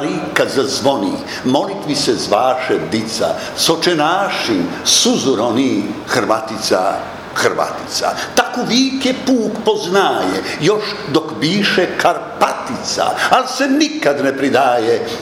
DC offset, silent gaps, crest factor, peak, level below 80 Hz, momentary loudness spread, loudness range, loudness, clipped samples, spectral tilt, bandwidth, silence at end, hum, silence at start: under 0.1%; none; 16 dB; 0 dBFS; -54 dBFS; 5 LU; 2 LU; -15 LUFS; under 0.1%; -3.5 dB/octave; 18 kHz; 0 s; none; 0 s